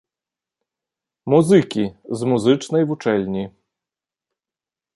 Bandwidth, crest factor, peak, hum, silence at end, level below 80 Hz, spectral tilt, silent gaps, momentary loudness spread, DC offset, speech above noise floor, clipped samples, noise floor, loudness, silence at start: 11.5 kHz; 18 dB; -2 dBFS; none; 1.45 s; -58 dBFS; -6.5 dB/octave; none; 13 LU; under 0.1%; over 72 dB; under 0.1%; under -90 dBFS; -19 LUFS; 1.25 s